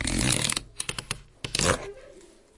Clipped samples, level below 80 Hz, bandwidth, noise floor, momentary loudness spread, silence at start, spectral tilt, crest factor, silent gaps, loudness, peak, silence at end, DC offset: under 0.1%; -42 dBFS; 11.5 kHz; -52 dBFS; 14 LU; 0 s; -2.5 dB/octave; 24 dB; none; -27 LUFS; -4 dBFS; 0.35 s; under 0.1%